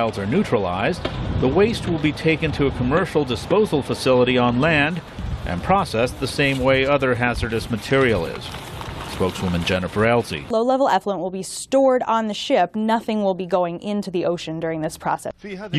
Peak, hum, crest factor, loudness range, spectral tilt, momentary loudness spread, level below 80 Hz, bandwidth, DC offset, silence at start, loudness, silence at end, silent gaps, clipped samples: -6 dBFS; none; 16 dB; 3 LU; -5.5 dB/octave; 10 LU; -38 dBFS; 13 kHz; under 0.1%; 0 s; -20 LUFS; 0 s; none; under 0.1%